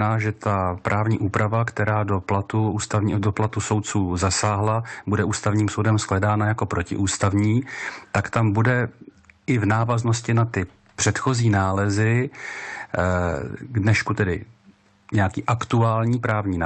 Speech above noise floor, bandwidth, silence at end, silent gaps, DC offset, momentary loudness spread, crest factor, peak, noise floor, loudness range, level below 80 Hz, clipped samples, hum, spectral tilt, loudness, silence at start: 34 dB; 9 kHz; 0 s; none; under 0.1%; 6 LU; 14 dB; -8 dBFS; -55 dBFS; 1 LU; -52 dBFS; under 0.1%; none; -6 dB/octave; -22 LUFS; 0 s